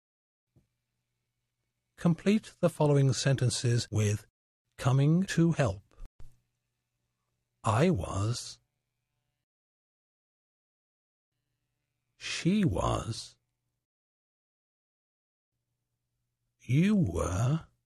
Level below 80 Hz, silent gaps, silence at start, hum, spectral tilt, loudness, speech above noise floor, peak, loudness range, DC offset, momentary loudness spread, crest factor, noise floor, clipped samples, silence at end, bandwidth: -52 dBFS; 4.30-4.65 s, 6.06-6.19 s, 9.43-11.32 s, 13.85-15.52 s; 2 s; 60 Hz at -55 dBFS; -6 dB/octave; -29 LUFS; 57 dB; -14 dBFS; 10 LU; under 0.1%; 11 LU; 18 dB; -84 dBFS; under 0.1%; 0.25 s; 13 kHz